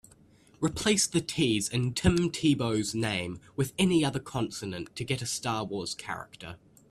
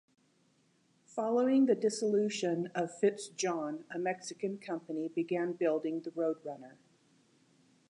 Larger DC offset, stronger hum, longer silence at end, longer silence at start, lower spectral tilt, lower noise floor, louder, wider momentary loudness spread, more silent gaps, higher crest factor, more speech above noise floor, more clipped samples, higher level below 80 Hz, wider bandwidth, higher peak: neither; neither; second, 0.35 s vs 1.2 s; second, 0.6 s vs 1.15 s; about the same, -4.5 dB/octave vs -5 dB/octave; second, -59 dBFS vs -71 dBFS; first, -29 LUFS vs -34 LUFS; about the same, 12 LU vs 11 LU; neither; about the same, 20 dB vs 18 dB; second, 30 dB vs 38 dB; neither; first, -52 dBFS vs -90 dBFS; first, 14 kHz vs 11 kHz; first, -10 dBFS vs -16 dBFS